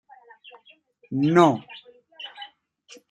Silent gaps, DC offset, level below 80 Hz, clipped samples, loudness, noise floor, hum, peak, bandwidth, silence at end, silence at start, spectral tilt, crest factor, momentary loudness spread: none; under 0.1%; -70 dBFS; under 0.1%; -21 LUFS; -57 dBFS; none; -2 dBFS; 11 kHz; 0.65 s; 1.1 s; -7 dB/octave; 24 dB; 26 LU